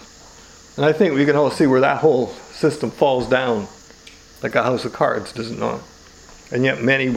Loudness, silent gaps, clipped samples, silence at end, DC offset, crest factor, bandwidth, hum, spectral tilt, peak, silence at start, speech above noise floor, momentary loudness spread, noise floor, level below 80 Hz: -19 LUFS; none; under 0.1%; 0 s; under 0.1%; 20 dB; 15 kHz; none; -6 dB/octave; 0 dBFS; 0 s; 26 dB; 12 LU; -44 dBFS; -52 dBFS